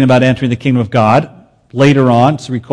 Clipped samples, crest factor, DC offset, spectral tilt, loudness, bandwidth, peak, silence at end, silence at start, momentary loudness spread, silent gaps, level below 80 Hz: under 0.1%; 10 dB; under 0.1%; -7.5 dB/octave; -11 LUFS; 10 kHz; 0 dBFS; 0 s; 0 s; 10 LU; none; -46 dBFS